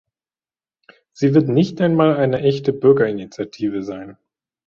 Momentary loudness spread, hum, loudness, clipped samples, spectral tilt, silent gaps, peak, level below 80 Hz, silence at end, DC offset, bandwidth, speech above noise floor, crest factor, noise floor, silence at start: 12 LU; none; -17 LUFS; under 0.1%; -8 dB/octave; none; -2 dBFS; -56 dBFS; 0.55 s; under 0.1%; 7.2 kHz; over 73 dB; 18 dB; under -90 dBFS; 1.2 s